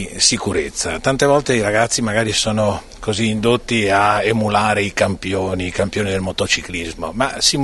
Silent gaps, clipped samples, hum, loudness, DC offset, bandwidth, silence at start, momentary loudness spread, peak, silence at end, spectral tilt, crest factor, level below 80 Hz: none; under 0.1%; none; -17 LUFS; under 0.1%; 12 kHz; 0 s; 7 LU; 0 dBFS; 0 s; -3.5 dB/octave; 18 dB; -38 dBFS